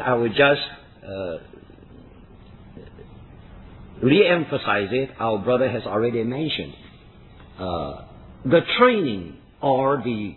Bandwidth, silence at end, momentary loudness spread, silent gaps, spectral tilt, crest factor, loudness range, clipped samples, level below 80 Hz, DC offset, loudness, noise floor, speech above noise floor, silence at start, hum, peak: 4.3 kHz; 0.05 s; 17 LU; none; -9 dB/octave; 22 dB; 6 LU; under 0.1%; -50 dBFS; under 0.1%; -21 LUFS; -47 dBFS; 26 dB; 0 s; none; -2 dBFS